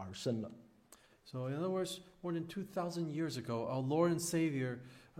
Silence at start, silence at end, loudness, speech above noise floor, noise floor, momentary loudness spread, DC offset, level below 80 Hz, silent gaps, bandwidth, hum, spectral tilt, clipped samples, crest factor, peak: 0 s; 0 s; -38 LUFS; 27 dB; -65 dBFS; 11 LU; under 0.1%; -74 dBFS; none; 16 kHz; none; -5.5 dB/octave; under 0.1%; 18 dB; -20 dBFS